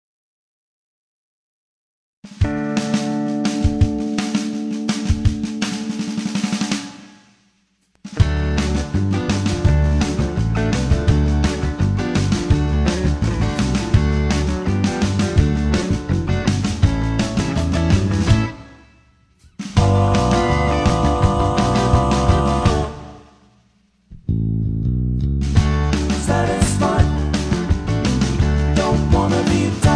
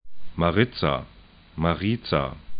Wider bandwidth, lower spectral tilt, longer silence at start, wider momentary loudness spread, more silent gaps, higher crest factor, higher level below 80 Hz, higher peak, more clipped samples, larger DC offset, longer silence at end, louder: first, 11 kHz vs 5.2 kHz; second, -6 dB/octave vs -11 dB/octave; first, 2.25 s vs 0.05 s; second, 6 LU vs 18 LU; neither; about the same, 16 dB vs 20 dB; first, -24 dBFS vs -42 dBFS; first, -2 dBFS vs -6 dBFS; neither; neither; about the same, 0 s vs 0 s; first, -19 LUFS vs -25 LUFS